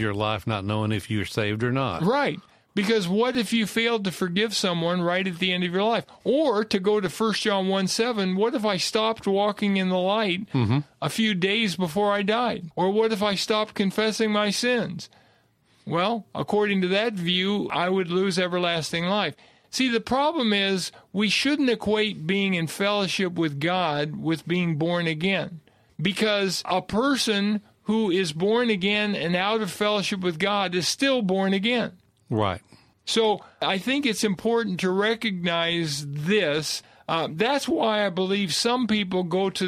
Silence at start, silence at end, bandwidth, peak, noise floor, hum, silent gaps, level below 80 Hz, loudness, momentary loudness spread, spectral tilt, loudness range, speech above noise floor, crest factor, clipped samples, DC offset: 0 s; 0 s; 15 kHz; -8 dBFS; -62 dBFS; none; none; -60 dBFS; -24 LUFS; 5 LU; -4.5 dB/octave; 2 LU; 38 dB; 16 dB; under 0.1%; under 0.1%